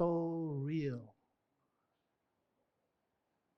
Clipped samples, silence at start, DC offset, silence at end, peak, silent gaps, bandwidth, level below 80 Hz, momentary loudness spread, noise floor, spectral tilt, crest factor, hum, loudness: under 0.1%; 0 s; under 0.1%; 2.45 s; -22 dBFS; none; 6.2 kHz; -78 dBFS; 7 LU; -84 dBFS; -9 dB/octave; 20 dB; none; -39 LUFS